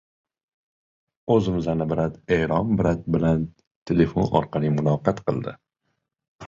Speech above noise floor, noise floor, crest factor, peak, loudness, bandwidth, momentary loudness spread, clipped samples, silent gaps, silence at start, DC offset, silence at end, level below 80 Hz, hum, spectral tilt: 54 dB; -76 dBFS; 20 dB; -4 dBFS; -23 LUFS; 7.4 kHz; 6 LU; under 0.1%; 3.67-3.86 s, 6.28-6.39 s; 1.25 s; under 0.1%; 0 s; -44 dBFS; none; -8.5 dB/octave